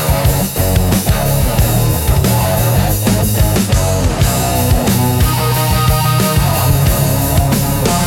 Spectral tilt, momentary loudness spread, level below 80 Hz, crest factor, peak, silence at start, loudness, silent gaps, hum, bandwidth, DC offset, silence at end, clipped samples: -5 dB/octave; 1 LU; -20 dBFS; 12 dB; 0 dBFS; 0 s; -13 LUFS; none; none; 17 kHz; under 0.1%; 0 s; under 0.1%